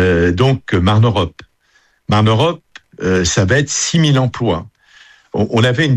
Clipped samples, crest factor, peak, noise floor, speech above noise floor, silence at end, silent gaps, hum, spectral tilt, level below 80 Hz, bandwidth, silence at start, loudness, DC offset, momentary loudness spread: under 0.1%; 14 dB; -2 dBFS; -56 dBFS; 43 dB; 0 s; none; none; -5 dB/octave; -38 dBFS; 10 kHz; 0 s; -14 LUFS; under 0.1%; 10 LU